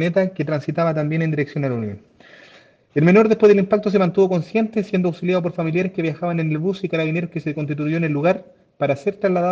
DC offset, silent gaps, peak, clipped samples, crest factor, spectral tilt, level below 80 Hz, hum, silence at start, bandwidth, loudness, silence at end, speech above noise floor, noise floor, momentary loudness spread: under 0.1%; none; -2 dBFS; under 0.1%; 16 dB; -8.5 dB/octave; -62 dBFS; none; 0 s; 7.2 kHz; -20 LUFS; 0 s; 31 dB; -50 dBFS; 11 LU